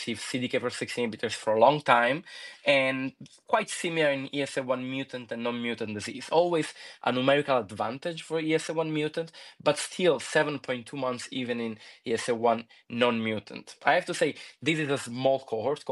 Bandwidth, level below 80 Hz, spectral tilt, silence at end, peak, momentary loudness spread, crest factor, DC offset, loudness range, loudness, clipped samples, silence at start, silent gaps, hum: 12 kHz; -78 dBFS; -4.5 dB/octave; 0 s; -6 dBFS; 10 LU; 22 dB; under 0.1%; 4 LU; -28 LUFS; under 0.1%; 0 s; none; none